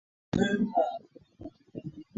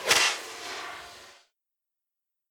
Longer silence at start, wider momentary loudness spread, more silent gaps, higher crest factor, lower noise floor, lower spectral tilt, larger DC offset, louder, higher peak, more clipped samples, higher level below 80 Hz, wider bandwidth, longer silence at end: first, 0.35 s vs 0 s; second, 21 LU vs 24 LU; neither; second, 18 dB vs 24 dB; second, -49 dBFS vs -87 dBFS; first, -6.5 dB/octave vs 1 dB/octave; neither; about the same, -29 LUFS vs -27 LUFS; second, -14 dBFS vs -8 dBFS; neither; first, -58 dBFS vs -70 dBFS; second, 7.8 kHz vs 19.5 kHz; second, 0.15 s vs 1.2 s